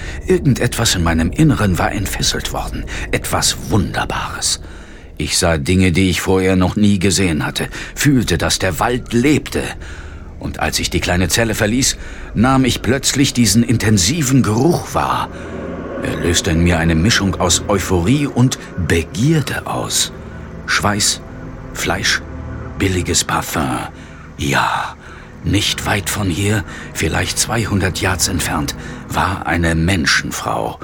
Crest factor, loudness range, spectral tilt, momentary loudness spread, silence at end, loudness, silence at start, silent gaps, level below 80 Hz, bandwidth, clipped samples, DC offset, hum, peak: 16 dB; 4 LU; -4 dB/octave; 13 LU; 0 s; -16 LUFS; 0 s; none; -30 dBFS; 17.5 kHz; under 0.1%; under 0.1%; none; -2 dBFS